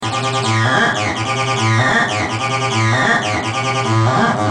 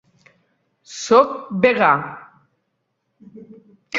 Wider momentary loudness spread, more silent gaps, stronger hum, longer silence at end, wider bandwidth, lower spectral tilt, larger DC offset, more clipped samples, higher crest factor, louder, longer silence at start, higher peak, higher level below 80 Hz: second, 5 LU vs 20 LU; neither; neither; about the same, 0 s vs 0 s; first, 10 kHz vs 7.8 kHz; about the same, -4.5 dB/octave vs -4.5 dB/octave; neither; neither; about the same, 16 dB vs 20 dB; about the same, -15 LUFS vs -16 LUFS; second, 0 s vs 0.9 s; about the same, 0 dBFS vs -2 dBFS; first, -50 dBFS vs -64 dBFS